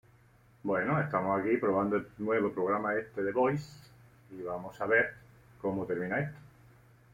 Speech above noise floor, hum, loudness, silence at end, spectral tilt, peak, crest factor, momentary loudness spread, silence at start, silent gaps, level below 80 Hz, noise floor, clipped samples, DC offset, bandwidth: 31 dB; none; -32 LUFS; 0.65 s; -8 dB/octave; -14 dBFS; 20 dB; 11 LU; 0.65 s; none; -66 dBFS; -62 dBFS; under 0.1%; under 0.1%; 16 kHz